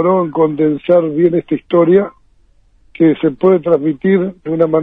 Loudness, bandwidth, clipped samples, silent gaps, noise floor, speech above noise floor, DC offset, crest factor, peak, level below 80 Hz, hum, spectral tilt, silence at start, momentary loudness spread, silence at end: -13 LUFS; 3.9 kHz; under 0.1%; none; -50 dBFS; 38 dB; under 0.1%; 12 dB; 0 dBFS; -54 dBFS; none; -11 dB/octave; 0 s; 5 LU; 0 s